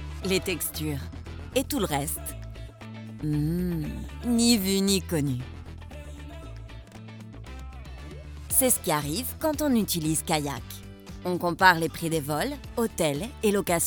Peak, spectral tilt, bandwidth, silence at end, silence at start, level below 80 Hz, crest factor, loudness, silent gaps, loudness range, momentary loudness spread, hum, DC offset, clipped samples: -4 dBFS; -4 dB/octave; 19 kHz; 0 s; 0 s; -44 dBFS; 24 dB; -26 LUFS; none; 5 LU; 21 LU; none; under 0.1%; under 0.1%